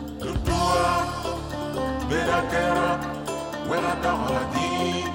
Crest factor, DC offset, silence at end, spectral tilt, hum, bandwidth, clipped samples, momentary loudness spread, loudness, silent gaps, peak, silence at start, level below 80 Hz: 14 dB; under 0.1%; 0 s; -5 dB/octave; none; 19.5 kHz; under 0.1%; 8 LU; -25 LUFS; none; -10 dBFS; 0 s; -38 dBFS